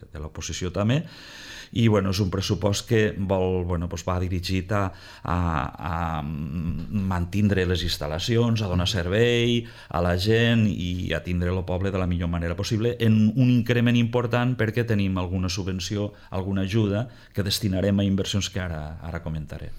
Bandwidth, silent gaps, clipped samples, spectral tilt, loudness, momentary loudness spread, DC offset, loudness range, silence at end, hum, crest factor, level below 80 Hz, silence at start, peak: 16 kHz; none; under 0.1%; -6 dB/octave; -25 LUFS; 11 LU; under 0.1%; 4 LU; 0 s; none; 16 dB; -42 dBFS; 0 s; -8 dBFS